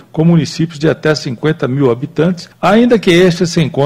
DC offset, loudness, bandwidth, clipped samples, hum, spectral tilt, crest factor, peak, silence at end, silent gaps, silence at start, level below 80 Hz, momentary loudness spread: under 0.1%; -12 LUFS; 12.5 kHz; under 0.1%; none; -6.5 dB/octave; 10 dB; 0 dBFS; 0 s; none; 0.15 s; -44 dBFS; 7 LU